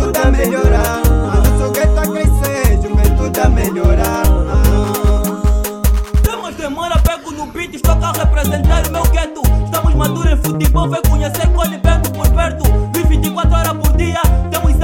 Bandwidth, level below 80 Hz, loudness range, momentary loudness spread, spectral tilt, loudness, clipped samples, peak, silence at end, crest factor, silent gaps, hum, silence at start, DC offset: 17 kHz; -14 dBFS; 2 LU; 3 LU; -6 dB/octave; -14 LUFS; under 0.1%; 0 dBFS; 0 s; 12 dB; none; none; 0 s; under 0.1%